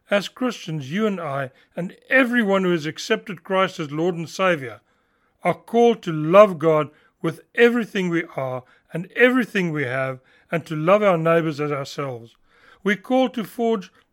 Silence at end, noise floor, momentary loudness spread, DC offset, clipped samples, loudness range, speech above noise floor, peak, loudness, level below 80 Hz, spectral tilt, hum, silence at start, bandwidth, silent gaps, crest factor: 0.25 s; -65 dBFS; 13 LU; under 0.1%; under 0.1%; 4 LU; 44 dB; 0 dBFS; -21 LUFS; -72 dBFS; -6 dB/octave; none; 0.1 s; 16.5 kHz; none; 22 dB